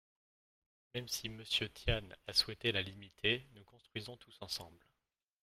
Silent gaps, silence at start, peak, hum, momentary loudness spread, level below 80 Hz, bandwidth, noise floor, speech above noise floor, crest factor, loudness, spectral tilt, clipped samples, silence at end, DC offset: none; 0.95 s; -18 dBFS; none; 14 LU; -54 dBFS; 16 kHz; -90 dBFS; 50 dB; 24 dB; -38 LUFS; -3 dB/octave; under 0.1%; 0.65 s; under 0.1%